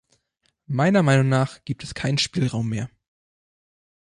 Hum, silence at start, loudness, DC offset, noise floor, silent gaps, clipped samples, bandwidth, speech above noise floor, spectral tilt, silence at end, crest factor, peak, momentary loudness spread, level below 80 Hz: none; 0.7 s; -22 LUFS; under 0.1%; -71 dBFS; none; under 0.1%; 11 kHz; 49 dB; -6 dB/octave; 1.2 s; 18 dB; -6 dBFS; 13 LU; -54 dBFS